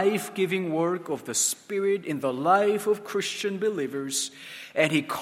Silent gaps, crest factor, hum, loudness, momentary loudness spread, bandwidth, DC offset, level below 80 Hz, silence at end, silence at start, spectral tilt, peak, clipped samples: none; 20 dB; none; -26 LUFS; 7 LU; 16.5 kHz; under 0.1%; -76 dBFS; 0 s; 0 s; -3.5 dB/octave; -6 dBFS; under 0.1%